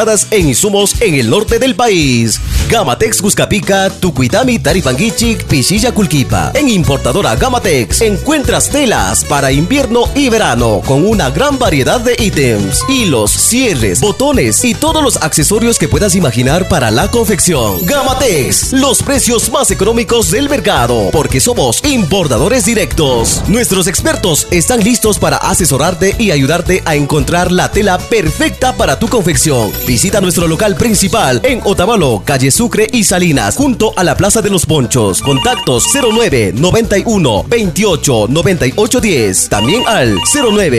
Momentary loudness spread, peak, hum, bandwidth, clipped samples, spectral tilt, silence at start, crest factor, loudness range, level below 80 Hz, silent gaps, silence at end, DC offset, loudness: 2 LU; 0 dBFS; none; 14 kHz; under 0.1%; -4 dB/octave; 0 s; 10 dB; 1 LU; -26 dBFS; none; 0 s; 0.3%; -10 LUFS